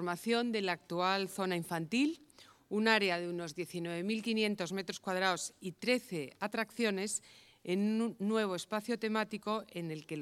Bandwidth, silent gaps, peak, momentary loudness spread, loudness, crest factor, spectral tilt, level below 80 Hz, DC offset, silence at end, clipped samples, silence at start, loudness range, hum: 15.5 kHz; none; -12 dBFS; 8 LU; -35 LUFS; 24 dB; -4 dB/octave; -80 dBFS; under 0.1%; 0 s; under 0.1%; 0 s; 2 LU; none